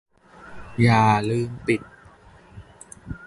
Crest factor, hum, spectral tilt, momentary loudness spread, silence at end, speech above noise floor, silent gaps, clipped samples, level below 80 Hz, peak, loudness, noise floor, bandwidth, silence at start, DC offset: 18 dB; none; -7 dB/octave; 26 LU; 0 s; 30 dB; none; under 0.1%; -50 dBFS; -6 dBFS; -21 LUFS; -50 dBFS; 11.5 kHz; 0.45 s; under 0.1%